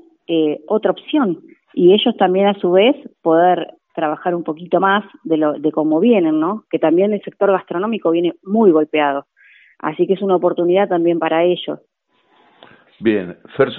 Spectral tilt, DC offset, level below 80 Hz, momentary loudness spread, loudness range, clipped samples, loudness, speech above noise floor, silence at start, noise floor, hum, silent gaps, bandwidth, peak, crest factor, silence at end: -4.5 dB/octave; under 0.1%; -66 dBFS; 9 LU; 3 LU; under 0.1%; -16 LUFS; 42 dB; 0.3 s; -58 dBFS; none; none; 4 kHz; 0 dBFS; 16 dB; 0 s